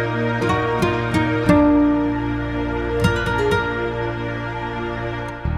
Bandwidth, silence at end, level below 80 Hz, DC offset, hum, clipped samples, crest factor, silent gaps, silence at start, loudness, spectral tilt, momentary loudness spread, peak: 13 kHz; 0 s; -34 dBFS; under 0.1%; none; under 0.1%; 16 dB; none; 0 s; -20 LUFS; -7 dB/octave; 10 LU; -2 dBFS